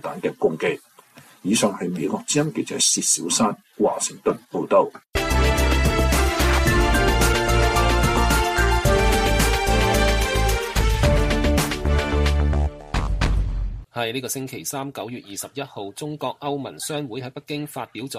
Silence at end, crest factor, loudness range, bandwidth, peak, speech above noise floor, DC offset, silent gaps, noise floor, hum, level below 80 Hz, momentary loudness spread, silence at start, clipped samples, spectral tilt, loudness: 0 s; 16 dB; 10 LU; 15.5 kHz; -6 dBFS; 25 dB; under 0.1%; none; -49 dBFS; none; -26 dBFS; 13 LU; 0.05 s; under 0.1%; -4 dB/octave; -21 LUFS